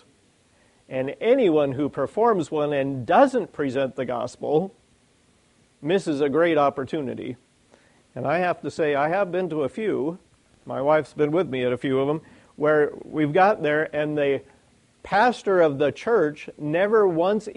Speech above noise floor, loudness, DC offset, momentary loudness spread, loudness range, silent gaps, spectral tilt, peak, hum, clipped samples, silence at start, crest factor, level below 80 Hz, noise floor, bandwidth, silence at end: 39 dB; -23 LUFS; under 0.1%; 11 LU; 4 LU; none; -6.5 dB/octave; -6 dBFS; none; under 0.1%; 0.9 s; 18 dB; -64 dBFS; -61 dBFS; 10.5 kHz; 0.05 s